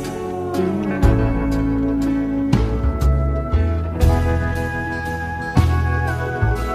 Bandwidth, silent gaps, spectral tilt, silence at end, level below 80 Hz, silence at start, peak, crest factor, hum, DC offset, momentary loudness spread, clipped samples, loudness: 14.5 kHz; none; -7.5 dB/octave; 0 s; -22 dBFS; 0 s; -2 dBFS; 16 dB; none; under 0.1%; 6 LU; under 0.1%; -20 LUFS